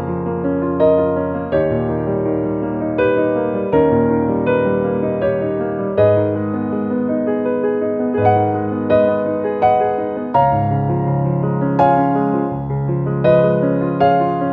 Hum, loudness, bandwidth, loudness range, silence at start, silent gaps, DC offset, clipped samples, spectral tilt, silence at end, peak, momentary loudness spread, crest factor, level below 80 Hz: none; -17 LUFS; 4.7 kHz; 1 LU; 0 s; none; under 0.1%; under 0.1%; -11 dB/octave; 0 s; -2 dBFS; 6 LU; 14 dB; -42 dBFS